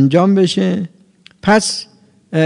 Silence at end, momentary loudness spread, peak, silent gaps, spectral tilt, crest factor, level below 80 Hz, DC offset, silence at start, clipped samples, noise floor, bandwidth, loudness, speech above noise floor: 0 s; 12 LU; 0 dBFS; none; -5.5 dB/octave; 14 dB; -54 dBFS; under 0.1%; 0 s; under 0.1%; -48 dBFS; 11 kHz; -15 LUFS; 35 dB